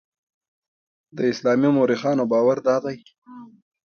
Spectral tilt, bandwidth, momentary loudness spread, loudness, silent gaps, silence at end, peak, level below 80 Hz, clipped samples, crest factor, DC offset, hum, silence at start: -7 dB/octave; 6.8 kHz; 13 LU; -20 LUFS; 3.18-3.22 s; 0.4 s; -6 dBFS; -66 dBFS; under 0.1%; 16 dB; under 0.1%; none; 1.15 s